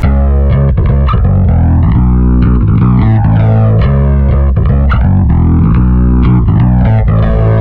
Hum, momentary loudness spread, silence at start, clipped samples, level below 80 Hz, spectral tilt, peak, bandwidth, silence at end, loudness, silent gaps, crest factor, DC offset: none; 2 LU; 0 s; under 0.1%; -10 dBFS; -11.5 dB/octave; 0 dBFS; 4.3 kHz; 0 s; -9 LUFS; none; 6 dB; under 0.1%